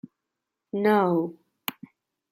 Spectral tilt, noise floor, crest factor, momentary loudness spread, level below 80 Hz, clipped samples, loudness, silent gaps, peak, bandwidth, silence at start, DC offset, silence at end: -6.5 dB/octave; -85 dBFS; 20 dB; 14 LU; -78 dBFS; under 0.1%; -26 LUFS; none; -8 dBFS; 16.5 kHz; 0.75 s; under 0.1%; 0.6 s